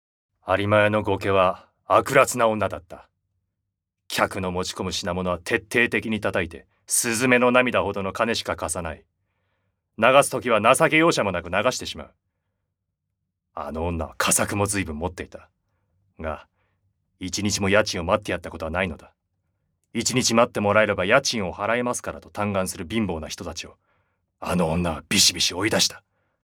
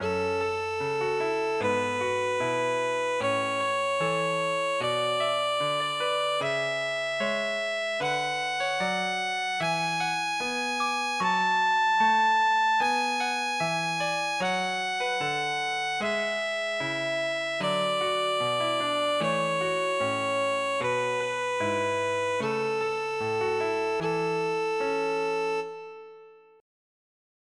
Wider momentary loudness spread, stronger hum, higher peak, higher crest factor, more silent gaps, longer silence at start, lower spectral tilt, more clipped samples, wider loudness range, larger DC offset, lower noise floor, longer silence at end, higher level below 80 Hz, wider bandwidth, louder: first, 16 LU vs 5 LU; neither; first, 0 dBFS vs -14 dBFS; first, 24 dB vs 14 dB; neither; first, 0.45 s vs 0 s; about the same, -3.5 dB/octave vs -3 dB/octave; neither; about the same, 6 LU vs 4 LU; neither; first, -81 dBFS vs -51 dBFS; second, 0.6 s vs 1.25 s; first, -52 dBFS vs -70 dBFS; first, 19.5 kHz vs 13.5 kHz; first, -22 LUFS vs -27 LUFS